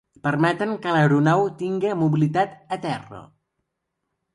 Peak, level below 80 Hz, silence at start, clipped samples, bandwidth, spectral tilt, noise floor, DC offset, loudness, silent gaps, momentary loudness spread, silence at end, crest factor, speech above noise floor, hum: -6 dBFS; -64 dBFS; 0.25 s; under 0.1%; 10.5 kHz; -7.5 dB/octave; -79 dBFS; under 0.1%; -22 LUFS; none; 12 LU; 1.1 s; 16 dB; 57 dB; none